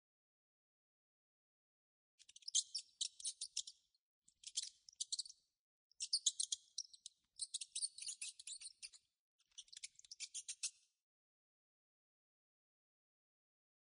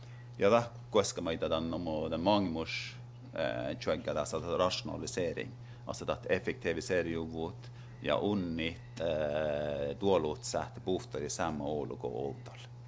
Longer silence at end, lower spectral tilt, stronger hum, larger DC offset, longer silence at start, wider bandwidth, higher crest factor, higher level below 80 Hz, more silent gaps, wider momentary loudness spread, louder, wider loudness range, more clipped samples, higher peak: first, 3.15 s vs 0 s; second, 6.5 dB/octave vs -5 dB/octave; neither; neither; first, 2.45 s vs 0 s; first, 10 kHz vs 8 kHz; first, 30 dB vs 20 dB; second, under -90 dBFS vs -56 dBFS; first, 3.99-4.22 s, 5.59-5.90 s, 9.19-9.39 s vs none; first, 18 LU vs 11 LU; second, -45 LUFS vs -34 LUFS; first, 9 LU vs 3 LU; neither; second, -22 dBFS vs -14 dBFS